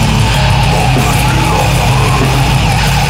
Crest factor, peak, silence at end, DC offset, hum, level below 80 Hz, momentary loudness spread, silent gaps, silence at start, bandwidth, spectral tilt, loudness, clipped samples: 10 dB; 0 dBFS; 0 s; under 0.1%; none; -18 dBFS; 0 LU; none; 0 s; 16.5 kHz; -5 dB/octave; -10 LUFS; under 0.1%